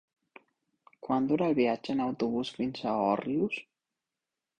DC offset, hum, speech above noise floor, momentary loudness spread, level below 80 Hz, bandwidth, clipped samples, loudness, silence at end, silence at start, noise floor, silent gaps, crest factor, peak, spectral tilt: under 0.1%; none; 60 dB; 7 LU; -68 dBFS; 9.4 kHz; under 0.1%; -30 LUFS; 0.95 s; 1.05 s; -89 dBFS; none; 18 dB; -14 dBFS; -7 dB/octave